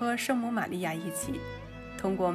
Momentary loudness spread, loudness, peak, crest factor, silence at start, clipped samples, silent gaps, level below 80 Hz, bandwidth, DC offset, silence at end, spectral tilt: 12 LU; -32 LUFS; -16 dBFS; 16 dB; 0 s; under 0.1%; none; -54 dBFS; 15.5 kHz; under 0.1%; 0 s; -4.5 dB/octave